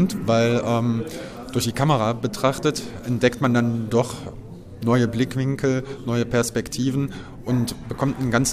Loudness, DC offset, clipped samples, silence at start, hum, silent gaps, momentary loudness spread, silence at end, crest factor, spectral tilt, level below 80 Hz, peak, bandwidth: -23 LUFS; under 0.1%; under 0.1%; 0 s; none; none; 10 LU; 0 s; 18 dB; -5.5 dB/octave; -46 dBFS; -4 dBFS; 15.5 kHz